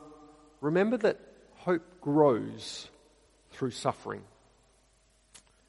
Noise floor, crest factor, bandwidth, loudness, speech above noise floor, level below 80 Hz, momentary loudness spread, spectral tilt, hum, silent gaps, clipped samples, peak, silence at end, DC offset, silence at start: -66 dBFS; 22 dB; 11.5 kHz; -30 LUFS; 37 dB; -68 dBFS; 17 LU; -6 dB/octave; none; none; under 0.1%; -10 dBFS; 1.45 s; under 0.1%; 0 s